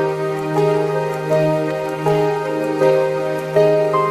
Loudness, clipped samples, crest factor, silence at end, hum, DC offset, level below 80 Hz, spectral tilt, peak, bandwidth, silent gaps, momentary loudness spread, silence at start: -18 LUFS; under 0.1%; 14 dB; 0 s; none; under 0.1%; -56 dBFS; -7 dB/octave; -2 dBFS; 13.5 kHz; none; 6 LU; 0 s